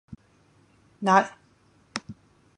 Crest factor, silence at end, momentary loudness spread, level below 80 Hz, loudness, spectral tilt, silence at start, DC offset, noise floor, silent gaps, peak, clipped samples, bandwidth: 26 dB; 0.45 s; 16 LU; -64 dBFS; -25 LUFS; -5 dB/octave; 0.1 s; under 0.1%; -61 dBFS; none; -4 dBFS; under 0.1%; 11 kHz